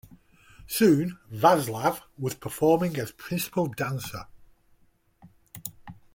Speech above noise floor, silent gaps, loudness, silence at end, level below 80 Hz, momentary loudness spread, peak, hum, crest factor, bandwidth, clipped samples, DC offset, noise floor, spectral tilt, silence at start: 37 dB; none; -26 LUFS; 0.2 s; -60 dBFS; 18 LU; -6 dBFS; none; 20 dB; 17 kHz; under 0.1%; under 0.1%; -62 dBFS; -5.5 dB/octave; 0.6 s